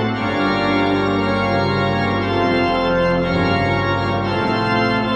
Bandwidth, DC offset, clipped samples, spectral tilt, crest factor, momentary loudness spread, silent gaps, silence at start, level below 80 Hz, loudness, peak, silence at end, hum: 8.8 kHz; under 0.1%; under 0.1%; -7 dB/octave; 12 dB; 2 LU; none; 0 s; -40 dBFS; -18 LUFS; -4 dBFS; 0 s; none